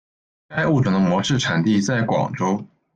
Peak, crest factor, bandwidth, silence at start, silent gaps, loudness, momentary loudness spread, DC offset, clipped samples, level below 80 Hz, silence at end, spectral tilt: -8 dBFS; 14 dB; 9 kHz; 0.5 s; none; -20 LUFS; 5 LU; under 0.1%; under 0.1%; -52 dBFS; 0.3 s; -5.5 dB/octave